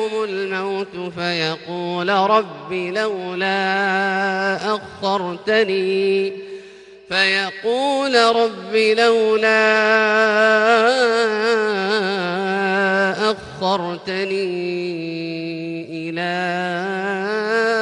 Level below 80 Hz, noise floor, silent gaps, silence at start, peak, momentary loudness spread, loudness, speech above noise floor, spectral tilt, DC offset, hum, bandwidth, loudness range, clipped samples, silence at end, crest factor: -64 dBFS; -41 dBFS; none; 0 s; -2 dBFS; 11 LU; -19 LUFS; 23 dB; -4.5 dB/octave; under 0.1%; none; 10.5 kHz; 8 LU; under 0.1%; 0 s; 16 dB